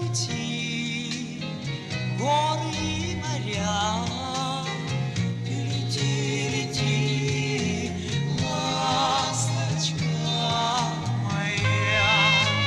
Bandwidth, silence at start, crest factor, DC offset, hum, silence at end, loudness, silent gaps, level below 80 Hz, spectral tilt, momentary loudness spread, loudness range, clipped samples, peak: 12.5 kHz; 0 s; 18 dB; under 0.1%; none; 0 s; -25 LUFS; none; -52 dBFS; -4 dB/octave; 7 LU; 3 LU; under 0.1%; -8 dBFS